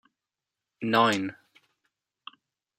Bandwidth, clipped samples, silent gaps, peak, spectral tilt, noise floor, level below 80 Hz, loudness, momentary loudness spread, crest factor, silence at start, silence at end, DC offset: 16 kHz; under 0.1%; none; -8 dBFS; -4.5 dB/octave; -89 dBFS; -76 dBFS; -26 LUFS; 26 LU; 24 dB; 0.8 s; 1.45 s; under 0.1%